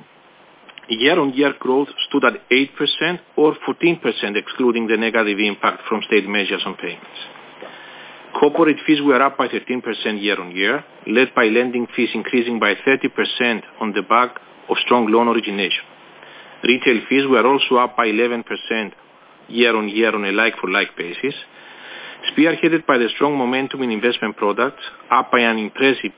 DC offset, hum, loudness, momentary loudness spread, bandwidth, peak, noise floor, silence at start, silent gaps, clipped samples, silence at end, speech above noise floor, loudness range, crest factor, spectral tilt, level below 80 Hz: under 0.1%; none; -18 LUFS; 10 LU; 4 kHz; -2 dBFS; -49 dBFS; 0.7 s; none; under 0.1%; 0.05 s; 31 dB; 2 LU; 18 dB; -8.5 dB/octave; -72 dBFS